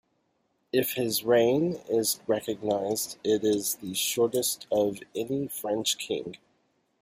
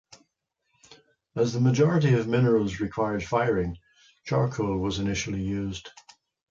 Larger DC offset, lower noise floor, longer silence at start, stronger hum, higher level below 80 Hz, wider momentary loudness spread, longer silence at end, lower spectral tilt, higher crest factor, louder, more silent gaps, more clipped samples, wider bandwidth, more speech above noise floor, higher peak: neither; second, -73 dBFS vs -77 dBFS; first, 0.75 s vs 0.1 s; neither; second, -68 dBFS vs -50 dBFS; second, 7 LU vs 14 LU; about the same, 0.65 s vs 0.6 s; second, -3.5 dB/octave vs -6.5 dB/octave; about the same, 16 dB vs 16 dB; about the same, -27 LUFS vs -26 LUFS; neither; neither; first, 15.5 kHz vs 7.6 kHz; second, 46 dB vs 53 dB; about the same, -12 dBFS vs -10 dBFS